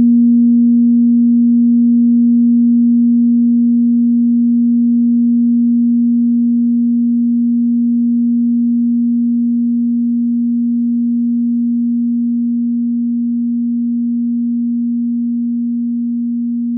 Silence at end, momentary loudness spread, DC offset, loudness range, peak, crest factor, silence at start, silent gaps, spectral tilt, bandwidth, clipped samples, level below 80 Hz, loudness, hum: 0 s; 6 LU; under 0.1%; 6 LU; -6 dBFS; 6 dB; 0 s; none; -19.5 dB/octave; 0.5 kHz; under 0.1%; -64 dBFS; -13 LUFS; 60 Hz at -85 dBFS